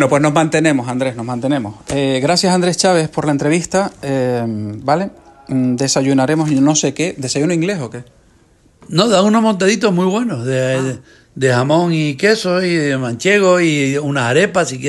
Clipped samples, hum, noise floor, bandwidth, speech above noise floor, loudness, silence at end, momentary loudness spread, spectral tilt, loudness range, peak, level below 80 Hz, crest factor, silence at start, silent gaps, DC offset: under 0.1%; none; -51 dBFS; 12.5 kHz; 36 dB; -15 LUFS; 0 s; 7 LU; -5 dB/octave; 2 LU; 0 dBFS; -52 dBFS; 14 dB; 0 s; none; under 0.1%